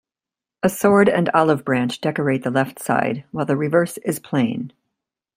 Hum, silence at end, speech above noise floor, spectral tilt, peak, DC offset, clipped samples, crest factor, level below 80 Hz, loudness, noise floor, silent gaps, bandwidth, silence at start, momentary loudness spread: none; 0.7 s; 70 dB; -6 dB/octave; -2 dBFS; under 0.1%; under 0.1%; 18 dB; -60 dBFS; -20 LUFS; -89 dBFS; none; 16 kHz; 0.65 s; 9 LU